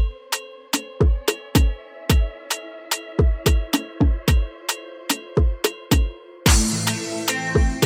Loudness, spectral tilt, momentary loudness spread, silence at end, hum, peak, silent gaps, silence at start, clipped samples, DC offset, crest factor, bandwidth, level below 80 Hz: -22 LUFS; -4.5 dB/octave; 9 LU; 0 s; none; -4 dBFS; none; 0 s; under 0.1%; under 0.1%; 18 dB; 16.5 kHz; -24 dBFS